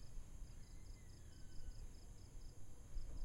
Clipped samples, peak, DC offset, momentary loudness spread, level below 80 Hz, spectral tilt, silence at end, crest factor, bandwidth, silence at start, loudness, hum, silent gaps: under 0.1%; -34 dBFS; under 0.1%; 4 LU; -54 dBFS; -5 dB/octave; 0 s; 14 dB; 14 kHz; 0 s; -60 LUFS; none; none